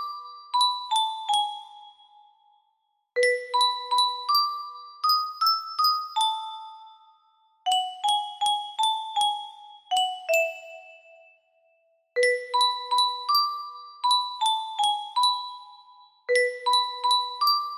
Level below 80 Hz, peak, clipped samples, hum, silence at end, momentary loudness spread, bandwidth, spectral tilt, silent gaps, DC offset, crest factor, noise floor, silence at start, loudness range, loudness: -80 dBFS; -10 dBFS; under 0.1%; none; 0 s; 13 LU; 15.5 kHz; 3 dB/octave; none; under 0.1%; 16 dB; -73 dBFS; 0 s; 3 LU; -24 LUFS